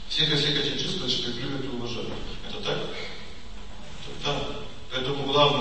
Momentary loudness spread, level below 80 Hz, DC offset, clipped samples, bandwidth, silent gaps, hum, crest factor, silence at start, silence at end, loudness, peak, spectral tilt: 20 LU; -44 dBFS; 2%; under 0.1%; 8.8 kHz; none; none; 22 dB; 0 s; 0 s; -27 LUFS; -8 dBFS; -4 dB/octave